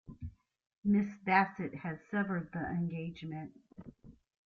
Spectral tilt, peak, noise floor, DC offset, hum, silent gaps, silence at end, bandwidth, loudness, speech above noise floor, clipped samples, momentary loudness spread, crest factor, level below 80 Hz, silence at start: -8.5 dB/octave; -14 dBFS; -56 dBFS; under 0.1%; none; 0.78-0.82 s; 0.35 s; 6.4 kHz; -35 LUFS; 22 dB; under 0.1%; 22 LU; 22 dB; -62 dBFS; 0.1 s